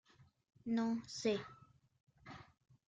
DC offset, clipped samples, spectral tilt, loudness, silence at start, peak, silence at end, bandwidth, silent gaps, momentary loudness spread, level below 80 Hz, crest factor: under 0.1%; under 0.1%; -5 dB/octave; -40 LUFS; 0.2 s; -24 dBFS; 0.45 s; 9 kHz; 2.03-2.07 s; 19 LU; -78 dBFS; 20 dB